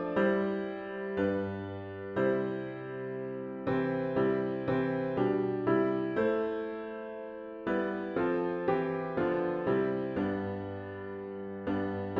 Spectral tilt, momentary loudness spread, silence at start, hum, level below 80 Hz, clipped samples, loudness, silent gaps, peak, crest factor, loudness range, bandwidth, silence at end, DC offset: -9.5 dB/octave; 11 LU; 0 s; none; -64 dBFS; under 0.1%; -33 LUFS; none; -16 dBFS; 16 dB; 3 LU; 5.2 kHz; 0 s; under 0.1%